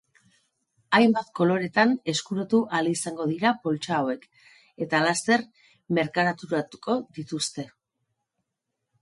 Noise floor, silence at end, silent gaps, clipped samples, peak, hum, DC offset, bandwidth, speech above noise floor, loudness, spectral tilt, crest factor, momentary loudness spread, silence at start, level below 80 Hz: -83 dBFS; 1.35 s; none; under 0.1%; -6 dBFS; none; under 0.1%; 11.5 kHz; 58 dB; -25 LUFS; -4.5 dB/octave; 20 dB; 9 LU; 0.9 s; -72 dBFS